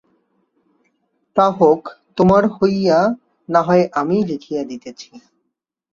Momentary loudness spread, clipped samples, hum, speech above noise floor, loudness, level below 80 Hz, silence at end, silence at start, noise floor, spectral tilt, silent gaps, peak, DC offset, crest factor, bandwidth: 17 LU; under 0.1%; none; 60 dB; -16 LUFS; -54 dBFS; 0.75 s; 1.35 s; -76 dBFS; -7.5 dB/octave; none; -2 dBFS; under 0.1%; 16 dB; 7.4 kHz